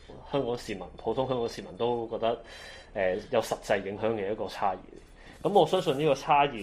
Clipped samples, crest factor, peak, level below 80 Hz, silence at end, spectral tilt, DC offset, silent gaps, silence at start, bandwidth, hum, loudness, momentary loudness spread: under 0.1%; 20 dB; -10 dBFS; -54 dBFS; 0 s; -5.5 dB/octave; under 0.1%; none; 0 s; 15 kHz; none; -29 LUFS; 11 LU